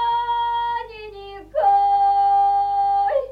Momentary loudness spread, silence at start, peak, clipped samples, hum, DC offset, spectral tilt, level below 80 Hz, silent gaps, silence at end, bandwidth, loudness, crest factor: 18 LU; 0 s; -8 dBFS; under 0.1%; 50 Hz at -50 dBFS; under 0.1%; -4 dB/octave; -50 dBFS; none; 0 s; 5 kHz; -19 LUFS; 12 dB